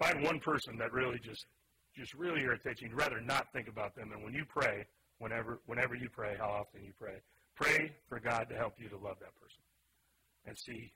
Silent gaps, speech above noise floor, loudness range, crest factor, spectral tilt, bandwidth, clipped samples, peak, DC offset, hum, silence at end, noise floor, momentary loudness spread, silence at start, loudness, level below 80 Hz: none; 37 dB; 2 LU; 22 dB; -4.5 dB/octave; 16 kHz; under 0.1%; -16 dBFS; under 0.1%; none; 0.05 s; -76 dBFS; 17 LU; 0 s; -37 LUFS; -66 dBFS